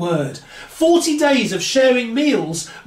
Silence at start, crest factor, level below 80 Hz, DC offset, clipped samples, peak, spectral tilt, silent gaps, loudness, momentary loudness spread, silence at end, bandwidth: 0 s; 14 dB; -56 dBFS; under 0.1%; under 0.1%; -2 dBFS; -4 dB/octave; none; -16 LUFS; 12 LU; 0.05 s; 16 kHz